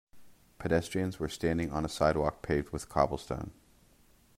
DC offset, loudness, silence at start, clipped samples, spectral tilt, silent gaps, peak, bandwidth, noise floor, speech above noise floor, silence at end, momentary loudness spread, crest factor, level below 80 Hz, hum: under 0.1%; -32 LUFS; 0.15 s; under 0.1%; -6 dB/octave; none; -10 dBFS; 16 kHz; -63 dBFS; 32 dB; 0.85 s; 11 LU; 24 dB; -50 dBFS; none